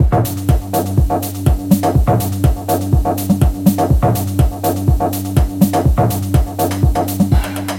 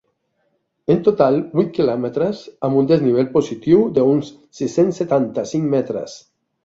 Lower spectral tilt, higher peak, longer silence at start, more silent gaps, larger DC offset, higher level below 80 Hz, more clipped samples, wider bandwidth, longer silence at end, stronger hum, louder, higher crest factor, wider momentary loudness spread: about the same, -7 dB/octave vs -7.5 dB/octave; about the same, 0 dBFS vs -2 dBFS; second, 0 s vs 0.9 s; neither; neither; first, -20 dBFS vs -56 dBFS; neither; first, 17 kHz vs 7.8 kHz; second, 0 s vs 0.45 s; neither; first, -15 LUFS vs -18 LUFS; about the same, 14 dB vs 16 dB; second, 3 LU vs 10 LU